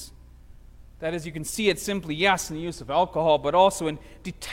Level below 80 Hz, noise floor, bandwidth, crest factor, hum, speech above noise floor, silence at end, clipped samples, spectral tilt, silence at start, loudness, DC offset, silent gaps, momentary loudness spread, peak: -48 dBFS; -47 dBFS; 16.5 kHz; 18 dB; none; 23 dB; 0 s; under 0.1%; -4 dB/octave; 0 s; -24 LUFS; under 0.1%; none; 15 LU; -6 dBFS